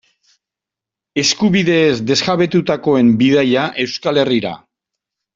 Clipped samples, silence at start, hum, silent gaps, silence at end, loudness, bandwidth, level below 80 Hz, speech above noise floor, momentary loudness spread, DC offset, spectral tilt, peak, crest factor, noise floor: under 0.1%; 1.15 s; none; none; 0.8 s; -14 LUFS; 7.8 kHz; -54 dBFS; 72 dB; 7 LU; under 0.1%; -5 dB/octave; -2 dBFS; 14 dB; -86 dBFS